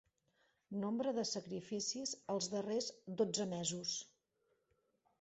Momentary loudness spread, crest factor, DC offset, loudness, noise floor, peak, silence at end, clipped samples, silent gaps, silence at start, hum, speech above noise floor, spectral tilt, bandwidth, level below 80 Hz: 7 LU; 18 dB; under 0.1%; -41 LUFS; -82 dBFS; -24 dBFS; 1.15 s; under 0.1%; none; 0.7 s; none; 41 dB; -4.5 dB/octave; 8 kHz; -82 dBFS